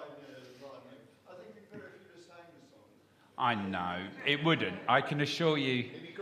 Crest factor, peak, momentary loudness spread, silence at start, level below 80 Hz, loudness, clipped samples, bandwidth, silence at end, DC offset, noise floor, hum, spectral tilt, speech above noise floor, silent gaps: 24 dB; -10 dBFS; 23 LU; 0 s; -78 dBFS; -31 LUFS; under 0.1%; 14.5 kHz; 0 s; under 0.1%; -63 dBFS; none; -5.5 dB/octave; 32 dB; none